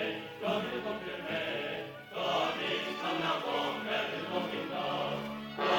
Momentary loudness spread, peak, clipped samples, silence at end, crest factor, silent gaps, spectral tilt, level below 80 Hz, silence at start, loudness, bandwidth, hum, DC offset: 6 LU; -14 dBFS; under 0.1%; 0 s; 20 dB; none; -4.5 dB/octave; -68 dBFS; 0 s; -34 LUFS; 17.5 kHz; none; under 0.1%